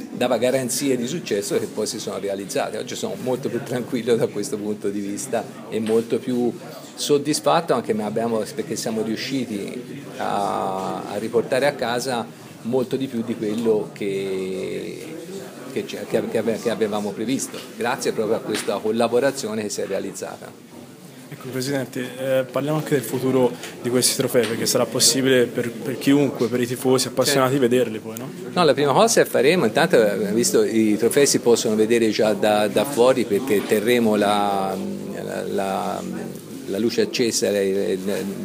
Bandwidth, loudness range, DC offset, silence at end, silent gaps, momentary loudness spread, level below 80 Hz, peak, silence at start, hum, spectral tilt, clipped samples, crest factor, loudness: 15.5 kHz; 7 LU; under 0.1%; 0 s; none; 12 LU; -68 dBFS; -2 dBFS; 0 s; none; -4 dB/octave; under 0.1%; 20 dB; -21 LUFS